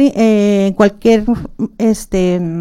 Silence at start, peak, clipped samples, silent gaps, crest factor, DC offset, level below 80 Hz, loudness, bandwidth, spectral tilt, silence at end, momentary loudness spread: 0 s; 0 dBFS; under 0.1%; none; 12 dB; under 0.1%; -34 dBFS; -13 LUFS; 14 kHz; -6.5 dB/octave; 0 s; 7 LU